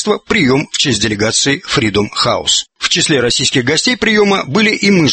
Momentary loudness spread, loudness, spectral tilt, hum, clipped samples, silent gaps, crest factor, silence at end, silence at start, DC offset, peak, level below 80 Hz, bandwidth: 3 LU; -12 LUFS; -3 dB/octave; none; under 0.1%; none; 12 dB; 0 s; 0 s; under 0.1%; 0 dBFS; -42 dBFS; 8.8 kHz